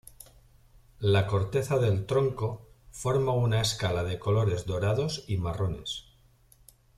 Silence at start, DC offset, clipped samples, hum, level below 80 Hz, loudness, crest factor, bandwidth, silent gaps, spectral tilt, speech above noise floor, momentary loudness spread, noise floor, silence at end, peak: 0.2 s; under 0.1%; under 0.1%; none; -50 dBFS; -28 LUFS; 16 dB; 14.5 kHz; none; -5.5 dB/octave; 33 dB; 10 LU; -60 dBFS; 0.95 s; -12 dBFS